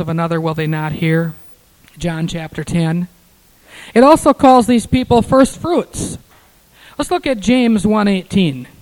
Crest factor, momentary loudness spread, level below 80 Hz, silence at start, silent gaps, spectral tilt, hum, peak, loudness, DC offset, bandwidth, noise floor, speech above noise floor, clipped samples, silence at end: 14 dB; 15 LU; -38 dBFS; 0 s; none; -6 dB/octave; none; 0 dBFS; -14 LUFS; under 0.1%; 18.5 kHz; -50 dBFS; 36 dB; under 0.1%; 0.2 s